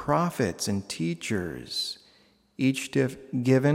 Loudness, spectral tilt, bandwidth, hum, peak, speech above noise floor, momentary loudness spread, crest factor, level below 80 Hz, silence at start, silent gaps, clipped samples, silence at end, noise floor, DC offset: -28 LUFS; -5.5 dB/octave; 16 kHz; none; -10 dBFS; 35 dB; 7 LU; 18 dB; -60 dBFS; 0 s; none; under 0.1%; 0 s; -61 dBFS; under 0.1%